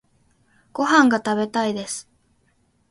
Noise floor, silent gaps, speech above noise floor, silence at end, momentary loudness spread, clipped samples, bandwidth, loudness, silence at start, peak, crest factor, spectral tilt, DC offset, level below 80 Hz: -64 dBFS; none; 45 dB; 0.9 s; 16 LU; under 0.1%; 11.5 kHz; -20 LUFS; 0.75 s; -2 dBFS; 22 dB; -3.5 dB/octave; under 0.1%; -66 dBFS